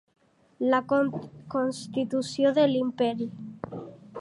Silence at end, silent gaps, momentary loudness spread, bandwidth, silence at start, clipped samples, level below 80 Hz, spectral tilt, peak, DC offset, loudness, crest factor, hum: 0 s; none; 16 LU; 11.5 kHz; 0.6 s; under 0.1%; -68 dBFS; -5.5 dB/octave; -10 dBFS; under 0.1%; -27 LUFS; 18 dB; none